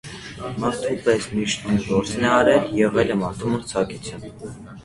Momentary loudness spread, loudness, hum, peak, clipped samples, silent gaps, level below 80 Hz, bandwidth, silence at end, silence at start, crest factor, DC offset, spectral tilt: 18 LU; -21 LUFS; none; -2 dBFS; under 0.1%; none; -48 dBFS; 11.5 kHz; 0 s; 0.05 s; 20 dB; under 0.1%; -5 dB/octave